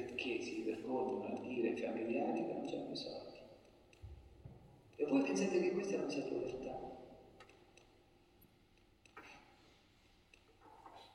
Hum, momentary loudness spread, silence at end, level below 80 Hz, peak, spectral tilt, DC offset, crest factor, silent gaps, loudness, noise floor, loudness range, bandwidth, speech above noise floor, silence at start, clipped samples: none; 24 LU; 0 s; -70 dBFS; -22 dBFS; -5 dB/octave; under 0.1%; 22 dB; none; -40 LUFS; -70 dBFS; 15 LU; 12.5 kHz; 31 dB; 0 s; under 0.1%